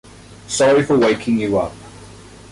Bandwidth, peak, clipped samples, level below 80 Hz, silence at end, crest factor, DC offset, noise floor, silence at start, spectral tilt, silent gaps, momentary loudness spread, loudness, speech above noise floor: 11.5 kHz; -6 dBFS; under 0.1%; -46 dBFS; 0.35 s; 12 dB; under 0.1%; -40 dBFS; 0.3 s; -5 dB/octave; none; 10 LU; -17 LUFS; 24 dB